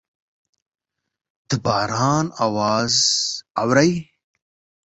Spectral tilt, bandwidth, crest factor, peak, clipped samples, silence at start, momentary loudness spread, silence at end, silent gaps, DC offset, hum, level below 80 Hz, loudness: -3.5 dB/octave; 8.2 kHz; 20 dB; -2 dBFS; under 0.1%; 1.5 s; 8 LU; 0.85 s; 3.50-3.55 s; under 0.1%; none; -56 dBFS; -19 LUFS